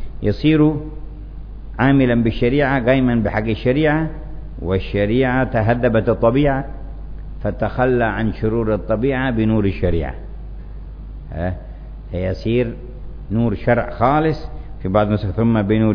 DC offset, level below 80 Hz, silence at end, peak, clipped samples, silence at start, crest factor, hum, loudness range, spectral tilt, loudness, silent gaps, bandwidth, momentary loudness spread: under 0.1%; -30 dBFS; 0 s; -2 dBFS; under 0.1%; 0 s; 16 dB; none; 6 LU; -10 dB/octave; -18 LUFS; none; 5.4 kHz; 19 LU